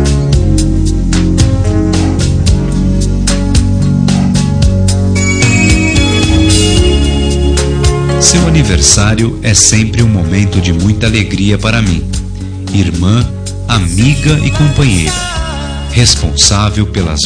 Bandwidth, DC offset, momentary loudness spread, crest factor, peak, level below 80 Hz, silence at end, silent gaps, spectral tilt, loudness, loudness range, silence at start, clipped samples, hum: 11 kHz; under 0.1%; 6 LU; 10 dB; 0 dBFS; -16 dBFS; 0 s; none; -4.5 dB/octave; -10 LUFS; 4 LU; 0 s; 0.3%; none